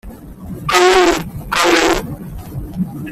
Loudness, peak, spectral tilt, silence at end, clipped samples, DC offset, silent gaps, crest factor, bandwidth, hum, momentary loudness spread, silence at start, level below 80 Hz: -14 LUFS; 0 dBFS; -3.5 dB/octave; 0 s; under 0.1%; under 0.1%; none; 16 dB; 15.5 kHz; none; 19 LU; 0.05 s; -34 dBFS